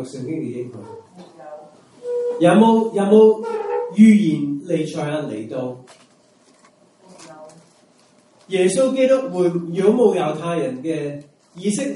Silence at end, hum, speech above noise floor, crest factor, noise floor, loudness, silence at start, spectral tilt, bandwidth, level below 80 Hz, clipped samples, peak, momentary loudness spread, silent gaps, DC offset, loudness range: 0 s; none; 37 dB; 18 dB; -54 dBFS; -18 LUFS; 0 s; -6.5 dB/octave; 11.5 kHz; -68 dBFS; under 0.1%; 0 dBFS; 20 LU; none; under 0.1%; 13 LU